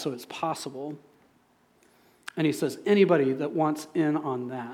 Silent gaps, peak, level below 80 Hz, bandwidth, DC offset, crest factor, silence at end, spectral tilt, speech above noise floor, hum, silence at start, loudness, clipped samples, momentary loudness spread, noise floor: none; -10 dBFS; -80 dBFS; 15.5 kHz; under 0.1%; 18 dB; 0 s; -6 dB/octave; 38 dB; none; 0 s; -27 LUFS; under 0.1%; 17 LU; -64 dBFS